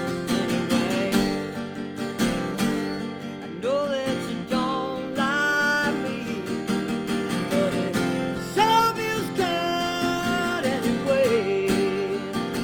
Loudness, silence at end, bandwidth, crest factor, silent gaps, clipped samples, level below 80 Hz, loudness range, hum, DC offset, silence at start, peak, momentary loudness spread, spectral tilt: -25 LUFS; 0 s; over 20 kHz; 16 dB; none; under 0.1%; -52 dBFS; 3 LU; none; under 0.1%; 0 s; -8 dBFS; 8 LU; -4.5 dB/octave